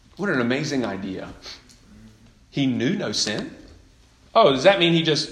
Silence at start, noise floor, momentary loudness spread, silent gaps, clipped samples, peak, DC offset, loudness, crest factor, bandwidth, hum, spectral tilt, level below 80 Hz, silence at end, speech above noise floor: 0.2 s; -53 dBFS; 21 LU; none; under 0.1%; -2 dBFS; under 0.1%; -21 LUFS; 20 dB; 11.5 kHz; none; -4.5 dB/octave; -54 dBFS; 0 s; 32 dB